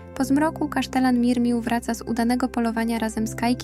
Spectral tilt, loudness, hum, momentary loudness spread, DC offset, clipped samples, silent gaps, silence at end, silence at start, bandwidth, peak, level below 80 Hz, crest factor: -5 dB/octave; -23 LUFS; none; 5 LU; under 0.1%; under 0.1%; none; 0 s; 0 s; 14.5 kHz; -10 dBFS; -44 dBFS; 14 dB